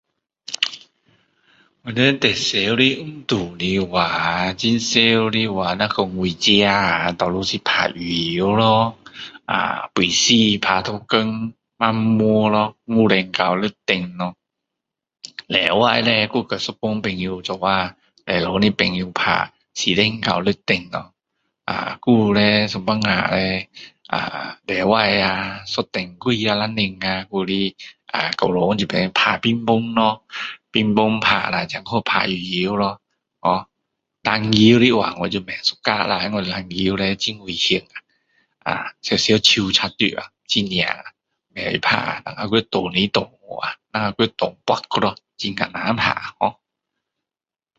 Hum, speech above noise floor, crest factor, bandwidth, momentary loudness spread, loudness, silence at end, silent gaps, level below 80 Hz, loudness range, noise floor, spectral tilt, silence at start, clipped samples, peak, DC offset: none; over 71 dB; 20 dB; 8 kHz; 12 LU; -19 LUFS; 1.25 s; none; -50 dBFS; 4 LU; under -90 dBFS; -4 dB/octave; 0.5 s; under 0.1%; 0 dBFS; under 0.1%